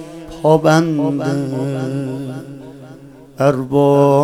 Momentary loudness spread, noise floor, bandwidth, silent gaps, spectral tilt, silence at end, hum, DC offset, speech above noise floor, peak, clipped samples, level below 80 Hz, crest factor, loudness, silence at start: 20 LU; -39 dBFS; 16 kHz; none; -7.5 dB/octave; 0 s; none; under 0.1%; 24 dB; 0 dBFS; under 0.1%; -50 dBFS; 16 dB; -16 LUFS; 0 s